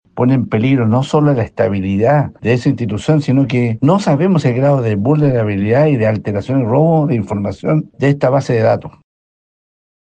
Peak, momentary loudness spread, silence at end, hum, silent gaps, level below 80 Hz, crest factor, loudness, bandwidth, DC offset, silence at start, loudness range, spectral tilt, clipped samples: -2 dBFS; 4 LU; 1.15 s; none; none; -50 dBFS; 12 dB; -14 LUFS; 8.8 kHz; under 0.1%; 0.15 s; 2 LU; -8.5 dB/octave; under 0.1%